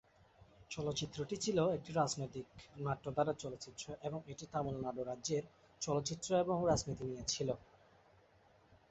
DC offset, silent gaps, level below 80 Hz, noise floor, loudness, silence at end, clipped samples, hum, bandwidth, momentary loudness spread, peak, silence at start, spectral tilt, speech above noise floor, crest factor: under 0.1%; none; -64 dBFS; -68 dBFS; -39 LUFS; 0.15 s; under 0.1%; none; 8.2 kHz; 12 LU; -20 dBFS; 0.4 s; -4.5 dB/octave; 29 dB; 20 dB